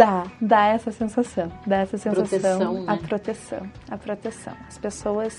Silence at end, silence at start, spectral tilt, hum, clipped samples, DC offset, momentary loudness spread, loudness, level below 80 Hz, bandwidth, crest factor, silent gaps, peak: 0 s; 0 s; -6 dB/octave; none; under 0.1%; under 0.1%; 16 LU; -24 LUFS; -52 dBFS; 11 kHz; 22 dB; none; 0 dBFS